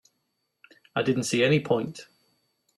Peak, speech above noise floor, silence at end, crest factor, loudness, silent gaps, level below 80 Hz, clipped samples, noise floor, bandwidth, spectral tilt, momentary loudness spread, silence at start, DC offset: -8 dBFS; 53 dB; 0.75 s; 20 dB; -25 LUFS; none; -66 dBFS; under 0.1%; -77 dBFS; 13 kHz; -5 dB/octave; 14 LU; 0.95 s; under 0.1%